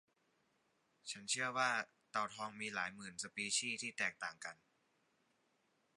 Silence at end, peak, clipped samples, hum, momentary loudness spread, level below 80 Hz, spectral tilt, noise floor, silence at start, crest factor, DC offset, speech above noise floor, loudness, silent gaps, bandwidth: 1.45 s; -22 dBFS; under 0.1%; none; 11 LU; -86 dBFS; -1 dB/octave; -80 dBFS; 1.05 s; 22 dB; under 0.1%; 38 dB; -41 LUFS; none; 11.5 kHz